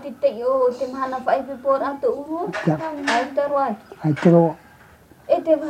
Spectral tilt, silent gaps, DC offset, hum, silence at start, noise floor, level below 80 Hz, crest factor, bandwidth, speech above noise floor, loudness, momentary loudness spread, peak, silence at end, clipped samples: -7 dB/octave; none; under 0.1%; none; 0 s; -49 dBFS; -60 dBFS; 18 dB; 10.5 kHz; 29 dB; -21 LUFS; 10 LU; -2 dBFS; 0 s; under 0.1%